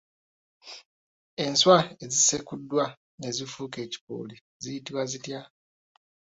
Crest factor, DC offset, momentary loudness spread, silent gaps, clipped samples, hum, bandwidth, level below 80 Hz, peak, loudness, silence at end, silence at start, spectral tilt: 24 dB; under 0.1%; 22 LU; 0.85-1.37 s, 2.97-3.18 s, 4.01-4.07 s, 4.41-4.60 s; under 0.1%; none; 8 kHz; -68 dBFS; -6 dBFS; -26 LUFS; 0.95 s; 0.65 s; -2.5 dB/octave